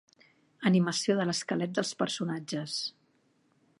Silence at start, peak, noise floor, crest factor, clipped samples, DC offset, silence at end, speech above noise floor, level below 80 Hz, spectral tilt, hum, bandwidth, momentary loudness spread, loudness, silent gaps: 0.6 s; -12 dBFS; -70 dBFS; 20 dB; under 0.1%; under 0.1%; 0.9 s; 40 dB; -78 dBFS; -4.5 dB/octave; none; 11.5 kHz; 8 LU; -30 LUFS; none